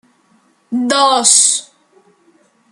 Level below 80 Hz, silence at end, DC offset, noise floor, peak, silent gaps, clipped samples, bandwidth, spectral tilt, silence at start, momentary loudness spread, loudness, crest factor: -72 dBFS; 1.1 s; under 0.1%; -55 dBFS; 0 dBFS; none; under 0.1%; over 20 kHz; 0 dB/octave; 0.7 s; 12 LU; -11 LUFS; 16 dB